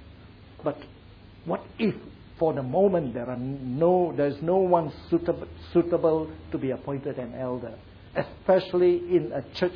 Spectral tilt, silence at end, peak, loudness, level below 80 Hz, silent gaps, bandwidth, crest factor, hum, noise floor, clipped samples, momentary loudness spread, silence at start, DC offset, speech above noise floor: -9.5 dB/octave; 0 s; -8 dBFS; -26 LUFS; -54 dBFS; none; 5.4 kHz; 20 dB; none; -48 dBFS; under 0.1%; 11 LU; 0 s; under 0.1%; 23 dB